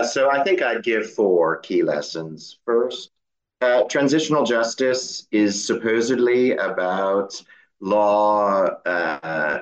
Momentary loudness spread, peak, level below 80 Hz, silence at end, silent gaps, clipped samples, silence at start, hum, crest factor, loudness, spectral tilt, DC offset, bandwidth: 8 LU; -6 dBFS; -72 dBFS; 0 s; none; under 0.1%; 0 s; none; 14 dB; -20 LUFS; -4 dB/octave; under 0.1%; 8.8 kHz